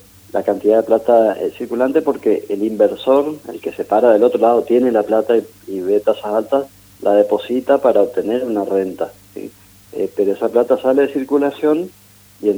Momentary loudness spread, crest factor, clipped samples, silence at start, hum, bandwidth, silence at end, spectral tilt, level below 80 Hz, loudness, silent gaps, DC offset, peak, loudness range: 13 LU; 16 dB; under 0.1%; 0.35 s; none; over 20 kHz; 0 s; -6.5 dB/octave; -60 dBFS; -16 LUFS; none; under 0.1%; 0 dBFS; 3 LU